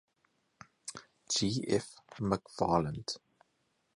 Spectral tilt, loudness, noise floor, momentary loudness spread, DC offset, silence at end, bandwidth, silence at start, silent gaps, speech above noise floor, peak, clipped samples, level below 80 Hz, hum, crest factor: -4.5 dB/octave; -34 LUFS; -77 dBFS; 16 LU; under 0.1%; 0.8 s; 11.5 kHz; 0.85 s; none; 44 dB; -12 dBFS; under 0.1%; -60 dBFS; none; 24 dB